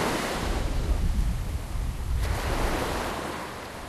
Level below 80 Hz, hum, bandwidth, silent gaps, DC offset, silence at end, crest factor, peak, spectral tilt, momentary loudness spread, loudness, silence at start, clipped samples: -30 dBFS; none; 13.5 kHz; none; under 0.1%; 0 s; 14 dB; -14 dBFS; -5 dB/octave; 6 LU; -30 LUFS; 0 s; under 0.1%